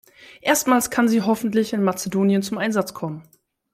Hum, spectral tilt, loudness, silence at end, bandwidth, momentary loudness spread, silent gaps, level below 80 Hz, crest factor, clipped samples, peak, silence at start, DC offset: none; -4.5 dB/octave; -21 LUFS; 0.5 s; 16 kHz; 11 LU; none; -62 dBFS; 18 dB; under 0.1%; -4 dBFS; 0.2 s; under 0.1%